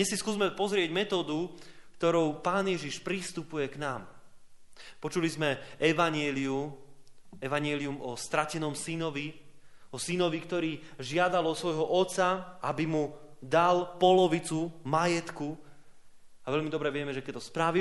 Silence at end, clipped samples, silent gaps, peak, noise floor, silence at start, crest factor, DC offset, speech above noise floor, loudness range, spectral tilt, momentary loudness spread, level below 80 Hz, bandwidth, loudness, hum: 0 s; under 0.1%; none; -12 dBFS; -50 dBFS; 0 s; 20 dB; under 0.1%; 20 dB; 6 LU; -4.5 dB/octave; 12 LU; -64 dBFS; 11.5 kHz; -30 LUFS; none